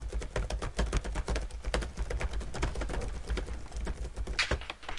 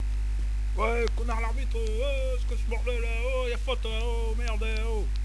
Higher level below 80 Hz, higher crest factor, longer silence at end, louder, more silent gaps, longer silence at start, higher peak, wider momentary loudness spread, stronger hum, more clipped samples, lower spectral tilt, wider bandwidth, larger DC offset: second, -36 dBFS vs -28 dBFS; first, 22 dB vs 14 dB; about the same, 0 s vs 0 s; second, -36 LUFS vs -30 LUFS; neither; about the same, 0 s vs 0 s; about the same, -12 dBFS vs -12 dBFS; first, 8 LU vs 3 LU; second, none vs 50 Hz at -30 dBFS; neither; about the same, -4.5 dB/octave vs -5.5 dB/octave; about the same, 11.5 kHz vs 11 kHz; second, under 0.1% vs 0.2%